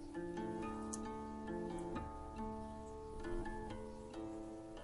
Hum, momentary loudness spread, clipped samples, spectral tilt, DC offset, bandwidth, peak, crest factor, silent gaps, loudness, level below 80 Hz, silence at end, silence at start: none; 6 LU; under 0.1%; -6 dB/octave; under 0.1%; 11.5 kHz; -22 dBFS; 22 dB; none; -47 LUFS; -56 dBFS; 0 s; 0 s